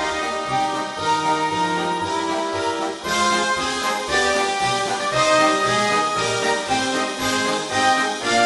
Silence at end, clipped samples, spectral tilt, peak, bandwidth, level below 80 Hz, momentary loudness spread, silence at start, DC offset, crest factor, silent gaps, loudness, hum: 0 s; under 0.1%; -2.5 dB/octave; -4 dBFS; 11.5 kHz; -52 dBFS; 6 LU; 0 s; under 0.1%; 16 dB; none; -20 LUFS; none